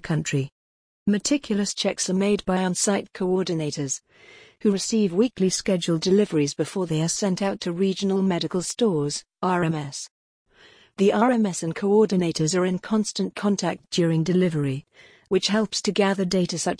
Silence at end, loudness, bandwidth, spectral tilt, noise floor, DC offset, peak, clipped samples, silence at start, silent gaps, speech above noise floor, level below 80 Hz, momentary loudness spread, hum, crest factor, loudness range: 0.05 s; -23 LUFS; 10.5 kHz; -5 dB/octave; -54 dBFS; under 0.1%; -8 dBFS; under 0.1%; 0.05 s; 0.52-1.06 s, 10.11-10.46 s; 31 dB; -58 dBFS; 7 LU; none; 16 dB; 2 LU